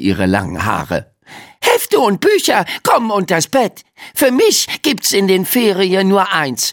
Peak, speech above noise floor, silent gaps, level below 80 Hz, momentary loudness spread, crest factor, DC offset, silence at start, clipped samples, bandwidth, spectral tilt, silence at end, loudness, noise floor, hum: 0 dBFS; 25 dB; none; -48 dBFS; 6 LU; 14 dB; under 0.1%; 0 s; under 0.1%; 17.5 kHz; -3.5 dB/octave; 0 s; -14 LUFS; -39 dBFS; none